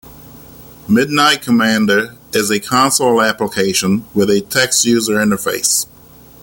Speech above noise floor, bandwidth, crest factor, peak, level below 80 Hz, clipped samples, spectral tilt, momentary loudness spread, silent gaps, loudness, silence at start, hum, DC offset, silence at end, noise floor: 27 dB; 17 kHz; 14 dB; 0 dBFS; -50 dBFS; under 0.1%; -3 dB/octave; 5 LU; none; -14 LUFS; 0.05 s; none; under 0.1%; 0.6 s; -41 dBFS